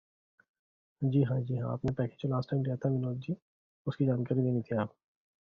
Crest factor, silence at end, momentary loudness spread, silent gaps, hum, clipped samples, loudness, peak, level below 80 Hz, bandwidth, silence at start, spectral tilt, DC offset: 16 dB; 0.65 s; 10 LU; 3.42-3.85 s; none; under 0.1%; -33 LUFS; -16 dBFS; -62 dBFS; 5.6 kHz; 1 s; -9 dB/octave; under 0.1%